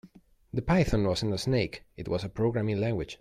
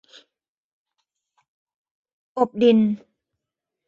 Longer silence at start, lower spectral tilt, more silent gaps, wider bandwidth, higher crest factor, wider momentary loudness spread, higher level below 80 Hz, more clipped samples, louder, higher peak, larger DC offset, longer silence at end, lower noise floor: second, 0.05 s vs 2.35 s; second, -6.5 dB/octave vs -8 dB/octave; neither; first, 14 kHz vs 7 kHz; second, 16 dB vs 22 dB; second, 9 LU vs 16 LU; first, -44 dBFS vs -70 dBFS; neither; second, -29 LUFS vs -19 LUFS; second, -12 dBFS vs -4 dBFS; neither; second, 0.05 s vs 0.9 s; second, -56 dBFS vs -85 dBFS